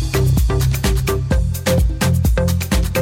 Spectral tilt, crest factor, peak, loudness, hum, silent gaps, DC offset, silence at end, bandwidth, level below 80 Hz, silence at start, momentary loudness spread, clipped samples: -5.5 dB/octave; 10 dB; -6 dBFS; -17 LUFS; none; none; under 0.1%; 0 s; 16.5 kHz; -20 dBFS; 0 s; 2 LU; under 0.1%